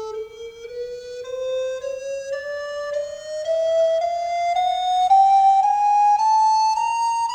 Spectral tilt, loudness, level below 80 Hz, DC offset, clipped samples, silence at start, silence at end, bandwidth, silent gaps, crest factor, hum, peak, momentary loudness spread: 0 dB/octave; -20 LUFS; -60 dBFS; under 0.1%; under 0.1%; 0 s; 0 s; 9.8 kHz; none; 12 dB; none; -8 dBFS; 17 LU